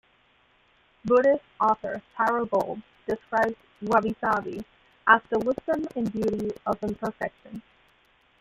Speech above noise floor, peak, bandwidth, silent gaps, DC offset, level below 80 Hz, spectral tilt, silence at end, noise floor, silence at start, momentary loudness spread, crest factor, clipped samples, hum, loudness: 38 dB; -4 dBFS; 15.5 kHz; none; under 0.1%; -60 dBFS; -6.5 dB/octave; 0.8 s; -63 dBFS; 1.05 s; 16 LU; 24 dB; under 0.1%; none; -26 LUFS